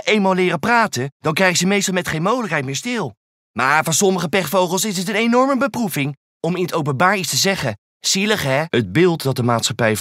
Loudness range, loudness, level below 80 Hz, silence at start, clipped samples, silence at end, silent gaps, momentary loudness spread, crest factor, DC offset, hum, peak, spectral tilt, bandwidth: 1 LU; -18 LUFS; -56 dBFS; 0.05 s; under 0.1%; 0 s; 1.12-1.20 s, 3.17-3.54 s, 6.17-6.40 s, 7.78-8.00 s; 7 LU; 18 dB; under 0.1%; none; 0 dBFS; -4 dB/octave; 16 kHz